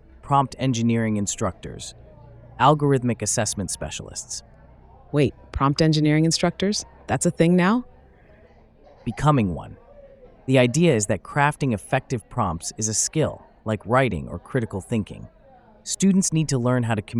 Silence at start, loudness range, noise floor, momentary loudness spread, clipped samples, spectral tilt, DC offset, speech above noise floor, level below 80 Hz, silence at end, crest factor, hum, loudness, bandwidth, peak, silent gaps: 0.25 s; 3 LU; -52 dBFS; 14 LU; under 0.1%; -5 dB/octave; under 0.1%; 30 dB; -46 dBFS; 0 s; 20 dB; none; -22 LUFS; 15.5 kHz; -4 dBFS; none